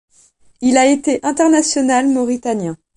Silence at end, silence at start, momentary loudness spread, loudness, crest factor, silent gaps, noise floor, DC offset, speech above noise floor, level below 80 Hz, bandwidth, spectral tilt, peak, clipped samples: 0.2 s; 0.6 s; 7 LU; -15 LUFS; 16 dB; none; -52 dBFS; under 0.1%; 38 dB; -56 dBFS; 11 kHz; -3.5 dB/octave; 0 dBFS; under 0.1%